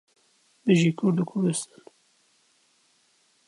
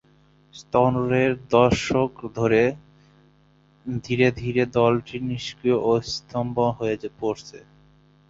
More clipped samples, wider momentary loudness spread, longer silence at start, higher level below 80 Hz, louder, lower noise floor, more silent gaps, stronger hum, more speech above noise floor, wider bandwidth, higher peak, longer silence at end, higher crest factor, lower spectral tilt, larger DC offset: neither; about the same, 11 LU vs 10 LU; about the same, 0.65 s vs 0.55 s; second, -76 dBFS vs -50 dBFS; about the same, -24 LUFS vs -23 LUFS; first, -66 dBFS vs -58 dBFS; neither; second, none vs 50 Hz at -55 dBFS; first, 42 dB vs 36 dB; first, 11.5 kHz vs 7.8 kHz; second, -8 dBFS vs -2 dBFS; first, 1.85 s vs 0.7 s; about the same, 20 dB vs 20 dB; about the same, -6 dB/octave vs -6.5 dB/octave; neither